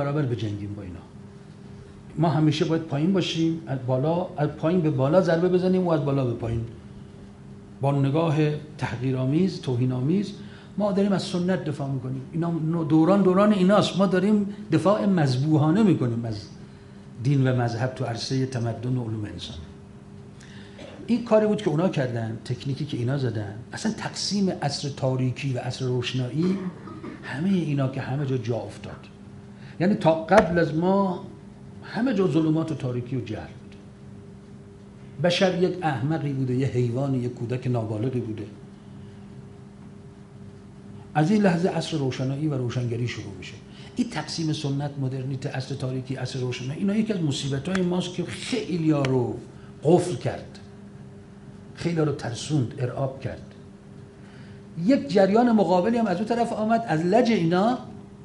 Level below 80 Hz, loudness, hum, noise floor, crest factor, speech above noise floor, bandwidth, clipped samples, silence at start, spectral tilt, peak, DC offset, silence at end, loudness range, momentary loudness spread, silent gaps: -54 dBFS; -24 LUFS; none; -45 dBFS; 22 dB; 21 dB; 11.5 kHz; under 0.1%; 0 s; -7 dB/octave; -2 dBFS; under 0.1%; 0 s; 7 LU; 24 LU; none